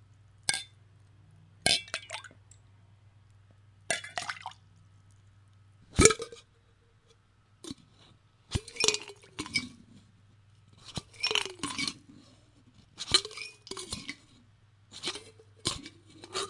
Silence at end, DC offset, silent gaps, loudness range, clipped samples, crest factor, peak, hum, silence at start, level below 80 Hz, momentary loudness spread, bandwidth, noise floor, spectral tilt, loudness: 0 s; under 0.1%; none; 9 LU; under 0.1%; 36 dB; 0 dBFS; none; 0.5 s; -54 dBFS; 22 LU; 11.5 kHz; -64 dBFS; -2 dB/octave; -31 LUFS